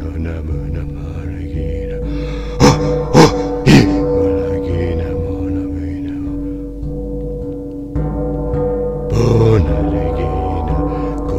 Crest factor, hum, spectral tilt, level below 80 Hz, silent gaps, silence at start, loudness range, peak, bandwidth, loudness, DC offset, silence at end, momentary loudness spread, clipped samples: 16 dB; none; -6.5 dB/octave; -24 dBFS; none; 0 s; 9 LU; 0 dBFS; 15 kHz; -17 LUFS; under 0.1%; 0 s; 14 LU; 0.2%